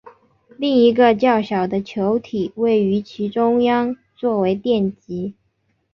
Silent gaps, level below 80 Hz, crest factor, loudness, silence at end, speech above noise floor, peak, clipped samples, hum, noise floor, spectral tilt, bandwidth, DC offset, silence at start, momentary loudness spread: none; -58 dBFS; 16 dB; -19 LUFS; 0.6 s; 49 dB; -2 dBFS; under 0.1%; none; -67 dBFS; -8 dB/octave; 6.6 kHz; under 0.1%; 0.05 s; 11 LU